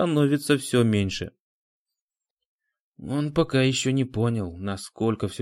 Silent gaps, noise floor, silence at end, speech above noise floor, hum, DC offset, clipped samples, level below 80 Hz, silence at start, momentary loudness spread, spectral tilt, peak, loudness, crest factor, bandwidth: 1.40-1.86 s, 2.02-2.08 s, 2.30-2.37 s, 2.45-2.59 s, 2.80-2.92 s; -89 dBFS; 0 s; 66 dB; none; under 0.1%; under 0.1%; -54 dBFS; 0 s; 11 LU; -5.5 dB/octave; -6 dBFS; -24 LUFS; 20 dB; 16 kHz